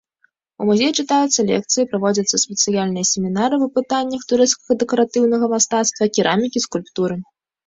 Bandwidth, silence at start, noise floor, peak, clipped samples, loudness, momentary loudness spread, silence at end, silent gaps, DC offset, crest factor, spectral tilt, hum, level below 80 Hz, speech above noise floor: 8 kHz; 0.6 s; -63 dBFS; -2 dBFS; under 0.1%; -18 LUFS; 6 LU; 0.45 s; none; under 0.1%; 16 dB; -3.5 dB/octave; none; -60 dBFS; 45 dB